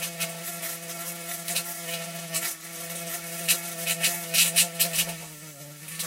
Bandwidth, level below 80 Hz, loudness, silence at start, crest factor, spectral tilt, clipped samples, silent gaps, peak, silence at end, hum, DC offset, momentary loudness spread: 16 kHz; -72 dBFS; -26 LUFS; 0 s; 24 dB; -0.5 dB/octave; under 0.1%; none; -6 dBFS; 0 s; none; under 0.1%; 15 LU